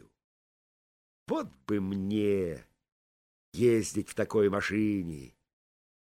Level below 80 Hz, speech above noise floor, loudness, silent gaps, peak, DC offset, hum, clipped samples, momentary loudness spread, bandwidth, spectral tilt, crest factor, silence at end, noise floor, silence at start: -62 dBFS; over 61 dB; -30 LUFS; 2.92-3.52 s; -14 dBFS; under 0.1%; none; under 0.1%; 12 LU; 16 kHz; -6 dB/octave; 18 dB; 0.85 s; under -90 dBFS; 1.3 s